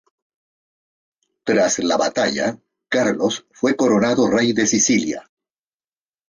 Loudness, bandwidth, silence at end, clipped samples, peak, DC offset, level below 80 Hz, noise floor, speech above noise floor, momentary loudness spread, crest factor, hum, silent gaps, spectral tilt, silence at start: -18 LUFS; 10 kHz; 1.1 s; under 0.1%; -4 dBFS; under 0.1%; -60 dBFS; under -90 dBFS; over 72 dB; 8 LU; 16 dB; none; none; -3.5 dB/octave; 1.45 s